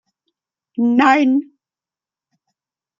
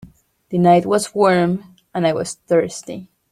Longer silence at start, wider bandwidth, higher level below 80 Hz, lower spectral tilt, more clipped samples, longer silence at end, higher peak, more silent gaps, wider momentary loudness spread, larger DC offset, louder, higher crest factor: first, 0.8 s vs 0.05 s; second, 7.4 kHz vs 14 kHz; second, -70 dBFS vs -58 dBFS; about the same, -5 dB/octave vs -6 dB/octave; neither; first, 1.55 s vs 0.3 s; about the same, 0 dBFS vs -2 dBFS; neither; second, 9 LU vs 16 LU; neither; about the same, -15 LUFS vs -17 LUFS; about the same, 20 dB vs 16 dB